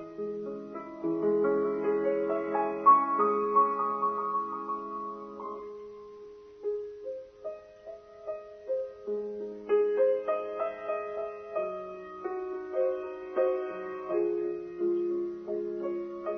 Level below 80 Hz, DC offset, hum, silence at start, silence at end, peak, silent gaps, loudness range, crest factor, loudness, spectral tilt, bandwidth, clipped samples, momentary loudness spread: -72 dBFS; under 0.1%; none; 0 s; 0 s; -10 dBFS; none; 13 LU; 20 dB; -31 LUFS; -8.5 dB/octave; 6 kHz; under 0.1%; 16 LU